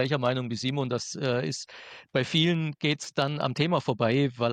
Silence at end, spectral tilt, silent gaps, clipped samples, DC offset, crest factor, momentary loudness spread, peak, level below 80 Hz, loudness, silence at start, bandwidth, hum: 0 s; -5.5 dB/octave; none; under 0.1%; under 0.1%; 16 dB; 7 LU; -10 dBFS; -66 dBFS; -28 LUFS; 0 s; 9.6 kHz; none